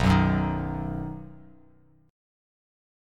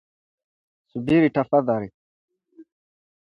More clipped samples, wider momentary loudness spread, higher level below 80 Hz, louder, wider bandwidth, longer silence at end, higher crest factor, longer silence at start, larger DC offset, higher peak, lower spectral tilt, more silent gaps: neither; about the same, 19 LU vs 17 LU; first, -40 dBFS vs -60 dBFS; second, -27 LUFS vs -21 LUFS; first, 11 kHz vs 5.6 kHz; first, 1.75 s vs 0.6 s; about the same, 20 dB vs 20 dB; second, 0 s vs 0.95 s; neither; about the same, -8 dBFS vs -6 dBFS; second, -7.5 dB/octave vs -9 dB/octave; second, none vs 1.94-2.28 s